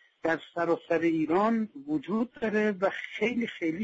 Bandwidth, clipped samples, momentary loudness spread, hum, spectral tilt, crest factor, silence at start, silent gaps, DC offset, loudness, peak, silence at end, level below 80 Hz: 7.8 kHz; under 0.1%; 6 LU; none; -7 dB/octave; 14 dB; 0.25 s; none; under 0.1%; -29 LUFS; -16 dBFS; 0 s; -68 dBFS